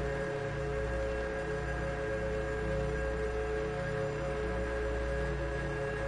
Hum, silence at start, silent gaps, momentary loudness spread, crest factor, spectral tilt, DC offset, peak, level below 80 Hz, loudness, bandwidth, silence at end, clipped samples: none; 0 s; none; 1 LU; 12 dB; -6.5 dB/octave; under 0.1%; -22 dBFS; -40 dBFS; -35 LUFS; 11 kHz; 0 s; under 0.1%